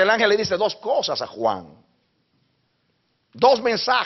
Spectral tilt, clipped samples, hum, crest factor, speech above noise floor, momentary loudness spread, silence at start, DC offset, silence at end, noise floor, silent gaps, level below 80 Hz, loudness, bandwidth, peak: -1 dB/octave; under 0.1%; none; 18 dB; 48 dB; 8 LU; 0 s; under 0.1%; 0 s; -68 dBFS; none; -64 dBFS; -21 LUFS; 6.4 kHz; -4 dBFS